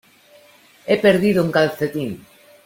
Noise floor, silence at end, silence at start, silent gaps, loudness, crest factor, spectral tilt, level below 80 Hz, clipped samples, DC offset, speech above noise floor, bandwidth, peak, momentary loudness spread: -50 dBFS; 0.45 s; 0.85 s; none; -18 LUFS; 18 dB; -6.5 dB/octave; -58 dBFS; under 0.1%; under 0.1%; 33 dB; 16.5 kHz; -2 dBFS; 17 LU